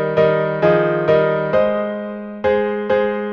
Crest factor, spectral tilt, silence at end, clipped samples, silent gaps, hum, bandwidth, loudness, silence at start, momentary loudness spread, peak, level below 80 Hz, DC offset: 16 dB; -8.5 dB/octave; 0 s; under 0.1%; none; none; 6.2 kHz; -17 LUFS; 0 s; 7 LU; -2 dBFS; -50 dBFS; under 0.1%